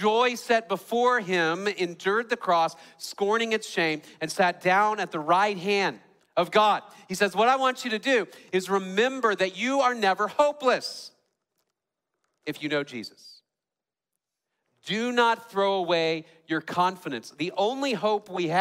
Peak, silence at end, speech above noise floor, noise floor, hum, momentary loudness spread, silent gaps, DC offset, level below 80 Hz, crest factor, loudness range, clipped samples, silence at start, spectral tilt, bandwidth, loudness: -8 dBFS; 0 s; over 65 dB; under -90 dBFS; none; 11 LU; none; under 0.1%; -76 dBFS; 18 dB; 8 LU; under 0.1%; 0 s; -4 dB/octave; 16 kHz; -25 LUFS